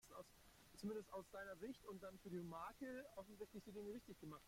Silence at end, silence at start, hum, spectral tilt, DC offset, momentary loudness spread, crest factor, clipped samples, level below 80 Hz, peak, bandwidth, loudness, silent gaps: 0 s; 0.05 s; none; -5.5 dB/octave; under 0.1%; 10 LU; 14 dB; under 0.1%; -76 dBFS; -40 dBFS; 16.5 kHz; -55 LUFS; none